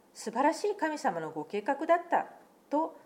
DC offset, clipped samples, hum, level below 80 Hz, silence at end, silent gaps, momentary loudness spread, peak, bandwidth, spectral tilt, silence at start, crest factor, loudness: under 0.1%; under 0.1%; none; -86 dBFS; 0.1 s; none; 9 LU; -14 dBFS; 16.5 kHz; -4.5 dB/octave; 0.15 s; 18 dB; -31 LUFS